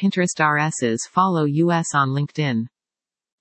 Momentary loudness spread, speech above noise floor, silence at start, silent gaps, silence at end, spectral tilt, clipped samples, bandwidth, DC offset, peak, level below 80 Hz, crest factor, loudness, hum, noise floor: 5 LU; over 70 dB; 0 s; none; 0.75 s; -5 dB/octave; under 0.1%; 8.8 kHz; under 0.1%; -2 dBFS; -70 dBFS; 18 dB; -20 LUFS; none; under -90 dBFS